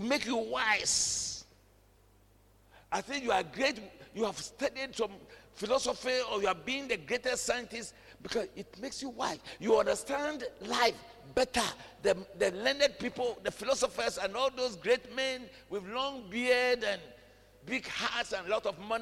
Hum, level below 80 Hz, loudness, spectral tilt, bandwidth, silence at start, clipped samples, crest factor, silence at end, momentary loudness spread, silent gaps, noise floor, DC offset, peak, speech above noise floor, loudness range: none; -62 dBFS; -33 LUFS; -2 dB/octave; 16 kHz; 0 s; under 0.1%; 20 dB; 0 s; 13 LU; none; -63 dBFS; under 0.1%; -12 dBFS; 30 dB; 4 LU